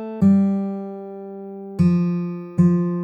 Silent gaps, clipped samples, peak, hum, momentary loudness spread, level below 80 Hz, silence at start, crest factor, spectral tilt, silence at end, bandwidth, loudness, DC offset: none; under 0.1%; -6 dBFS; none; 18 LU; -52 dBFS; 0 s; 14 dB; -10.5 dB/octave; 0 s; 5.8 kHz; -20 LUFS; under 0.1%